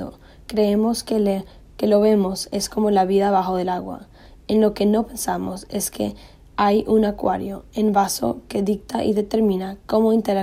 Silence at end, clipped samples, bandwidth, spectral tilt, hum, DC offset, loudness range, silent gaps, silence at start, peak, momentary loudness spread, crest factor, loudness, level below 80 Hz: 0 s; under 0.1%; 15.5 kHz; -5.5 dB/octave; none; under 0.1%; 2 LU; none; 0 s; -4 dBFS; 10 LU; 16 dB; -21 LUFS; -46 dBFS